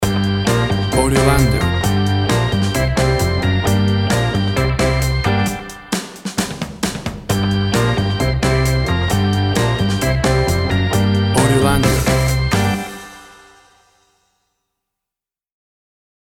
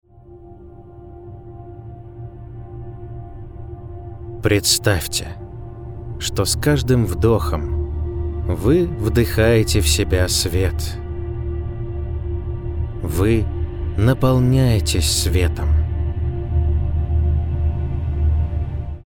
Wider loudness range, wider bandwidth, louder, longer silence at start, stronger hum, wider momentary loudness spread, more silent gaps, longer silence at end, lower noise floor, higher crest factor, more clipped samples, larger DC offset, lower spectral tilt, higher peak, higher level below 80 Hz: second, 4 LU vs 9 LU; second, 17 kHz vs over 20 kHz; first, -16 LUFS vs -19 LUFS; second, 0 s vs 0.15 s; neither; second, 9 LU vs 20 LU; neither; first, 3.1 s vs 0.05 s; first, -88 dBFS vs -42 dBFS; about the same, 16 dB vs 18 dB; neither; neither; about the same, -5.5 dB/octave vs -5 dB/octave; about the same, 0 dBFS vs -2 dBFS; about the same, -28 dBFS vs -28 dBFS